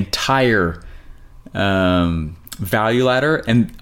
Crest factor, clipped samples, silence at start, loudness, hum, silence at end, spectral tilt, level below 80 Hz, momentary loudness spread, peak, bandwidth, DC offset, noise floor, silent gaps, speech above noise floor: 14 dB; under 0.1%; 0 s; -17 LUFS; none; 0.05 s; -5.5 dB/octave; -38 dBFS; 14 LU; -4 dBFS; 17 kHz; under 0.1%; -39 dBFS; none; 22 dB